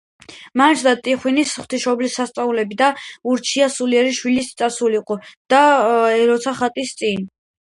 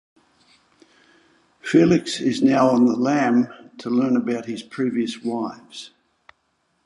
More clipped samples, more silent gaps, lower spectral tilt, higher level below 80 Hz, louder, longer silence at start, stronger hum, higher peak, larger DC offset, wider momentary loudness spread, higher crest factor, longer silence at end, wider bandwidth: neither; first, 5.37-5.45 s vs none; second, -3 dB/octave vs -6 dB/octave; about the same, -62 dBFS vs -62 dBFS; about the same, -18 LUFS vs -20 LUFS; second, 0.3 s vs 1.65 s; neither; first, 0 dBFS vs -4 dBFS; neither; second, 8 LU vs 17 LU; about the same, 18 dB vs 18 dB; second, 0.35 s vs 1 s; about the same, 11.5 kHz vs 11 kHz